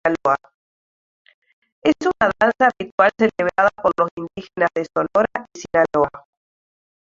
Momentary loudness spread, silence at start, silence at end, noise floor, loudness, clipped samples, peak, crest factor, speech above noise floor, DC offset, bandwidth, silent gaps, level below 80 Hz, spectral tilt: 7 LU; 0.05 s; 0.85 s; under -90 dBFS; -19 LUFS; under 0.1%; -2 dBFS; 18 dB; over 71 dB; under 0.1%; 7.6 kHz; 0.54-1.25 s, 1.34-1.42 s, 1.53-1.62 s, 1.72-1.82 s, 2.92-2.98 s, 4.11-4.17 s; -56 dBFS; -5.5 dB/octave